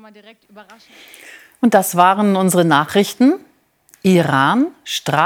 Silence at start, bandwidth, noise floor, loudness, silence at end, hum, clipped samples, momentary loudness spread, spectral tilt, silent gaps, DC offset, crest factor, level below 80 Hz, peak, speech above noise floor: 0.55 s; 19.5 kHz; -53 dBFS; -15 LUFS; 0 s; none; under 0.1%; 7 LU; -5 dB/octave; none; under 0.1%; 16 dB; -66 dBFS; 0 dBFS; 37 dB